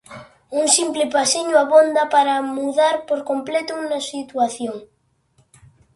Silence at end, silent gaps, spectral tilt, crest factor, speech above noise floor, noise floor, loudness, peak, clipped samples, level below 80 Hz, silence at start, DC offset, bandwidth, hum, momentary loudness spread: 1.1 s; none; -1.5 dB/octave; 18 dB; 42 dB; -61 dBFS; -18 LUFS; -2 dBFS; under 0.1%; -66 dBFS; 0.1 s; under 0.1%; 11.5 kHz; none; 12 LU